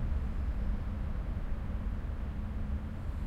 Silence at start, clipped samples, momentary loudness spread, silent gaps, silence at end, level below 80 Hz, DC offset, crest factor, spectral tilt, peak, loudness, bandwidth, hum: 0 s; under 0.1%; 3 LU; none; 0 s; -36 dBFS; under 0.1%; 12 dB; -8.5 dB/octave; -22 dBFS; -38 LUFS; 5.6 kHz; none